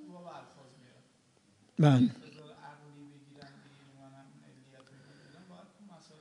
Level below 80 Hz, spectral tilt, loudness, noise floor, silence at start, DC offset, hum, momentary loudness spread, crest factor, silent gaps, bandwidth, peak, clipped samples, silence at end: -82 dBFS; -8 dB/octave; -27 LUFS; -67 dBFS; 0.35 s; under 0.1%; none; 30 LU; 26 dB; none; 10.5 kHz; -10 dBFS; under 0.1%; 4.05 s